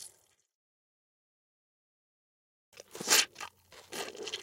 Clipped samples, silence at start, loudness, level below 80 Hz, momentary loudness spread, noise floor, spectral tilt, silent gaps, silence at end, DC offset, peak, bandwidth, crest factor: under 0.1%; 0 s; -29 LUFS; -82 dBFS; 23 LU; -61 dBFS; 1 dB/octave; 0.55-2.72 s; 0 s; under 0.1%; -8 dBFS; 16.5 kHz; 30 dB